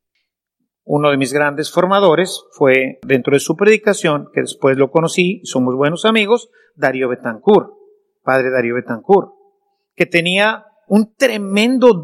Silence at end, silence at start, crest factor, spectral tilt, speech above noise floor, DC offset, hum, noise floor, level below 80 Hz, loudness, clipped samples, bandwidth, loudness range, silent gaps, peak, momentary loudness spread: 0 s; 0.9 s; 16 dB; -5 dB/octave; 60 dB; under 0.1%; none; -74 dBFS; -64 dBFS; -15 LUFS; 0.1%; 14.5 kHz; 3 LU; none; 0 dBFS; 8 LU